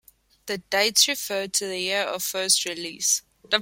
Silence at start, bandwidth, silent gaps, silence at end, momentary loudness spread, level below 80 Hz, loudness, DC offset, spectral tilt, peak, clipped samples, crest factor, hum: 0.45 s; 16.5 kHz; none; 0 s; 11 LU; -66 dBFS; -23 LUFS; under 0.1%; 0 dB/octave; -4 dBFS; under 0.1%; 20 dB; none